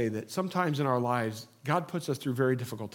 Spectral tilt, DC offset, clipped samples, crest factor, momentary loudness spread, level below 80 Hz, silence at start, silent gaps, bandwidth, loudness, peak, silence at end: -6.5 dB/octave; under 0.1%; under 0.1%; 18 dB; 6 LU; -80 dBFS; 0 s; none; 17.5 kHz; -31 LUFS; -12 dBFS; 0 s